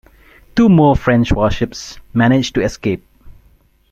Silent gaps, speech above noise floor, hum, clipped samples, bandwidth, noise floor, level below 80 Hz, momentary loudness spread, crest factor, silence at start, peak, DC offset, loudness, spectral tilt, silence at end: none; 38 dB; none; under 0.1%; 13.5 kHz; -52 dBFS; -32 dBFS; 12 LU; 14 dB; 0.55 s; -2 dBFS; under 0.1%; -15 LUFS; -6.5 dB/octave; 0.6 s